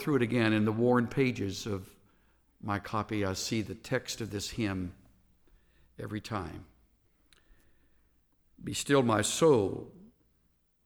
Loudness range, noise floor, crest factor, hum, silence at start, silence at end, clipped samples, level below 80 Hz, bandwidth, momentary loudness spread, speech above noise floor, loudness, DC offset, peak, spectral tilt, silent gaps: 14 LU; -72 dBFS; 20 dB; none; 0 s; 0.8 s; under 0.1%; -60 dBFS; over 20 kHz; 17 LU; 42 dB; -31 LUFS; under 0.1%; -12 dBFS; -5 dB/octave; none